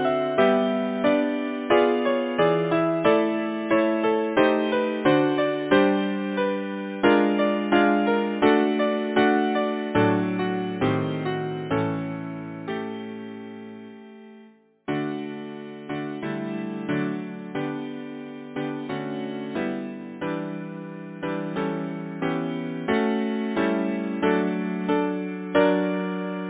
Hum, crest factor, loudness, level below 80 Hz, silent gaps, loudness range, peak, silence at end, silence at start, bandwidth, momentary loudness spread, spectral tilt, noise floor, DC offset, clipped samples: none; 18 dB; -24 LUFS; -60 dBFS; none; 10 LU; -6 dBFS; 0 s; 0 s; 4 kHz; 14 LU; -10.5 dB/octave; -52 dBFS; under 0.1%; under 0.1%